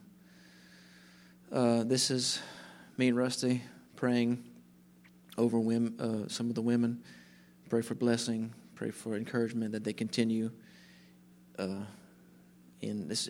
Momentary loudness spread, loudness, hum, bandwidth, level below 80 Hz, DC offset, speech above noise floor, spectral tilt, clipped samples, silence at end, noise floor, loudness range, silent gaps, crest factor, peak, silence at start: 14 LU; -33 LUFS; 60 Hz at -60 dBFS; 15.5 kHz; -78 dBFS; under 0.1%; 28 dB; -4.5 dB/octave; under 0.1%; 0 s; -60 dBFS; 5 LU; none; 20 dB; -14 dBFS; 1.5 s